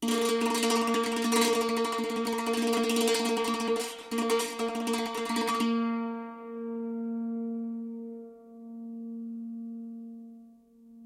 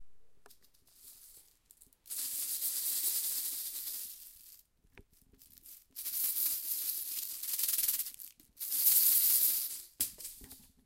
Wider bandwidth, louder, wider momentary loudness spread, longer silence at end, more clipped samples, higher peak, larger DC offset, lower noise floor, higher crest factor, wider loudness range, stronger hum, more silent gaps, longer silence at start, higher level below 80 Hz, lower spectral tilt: about the same, 16.5 kHz vs 17 kHz; about the same, -30 LUFS vs -31 LUFS; second, 17 LU vs 23 LU; second, 0 s vs 0.25 s; neither; second, -14 dBFS vs -10 dBFS; neither; second, -55 dBFS vs -65 dBFS; second, 16 dB vs 28 dB; first, 12 LU vs 9 LU; neither; neither; about the same, 0 s vs 0 s; about the same, -72 dBFS vs -72 dBFS; first, -3 dB/octave vs 2.5 dB/octave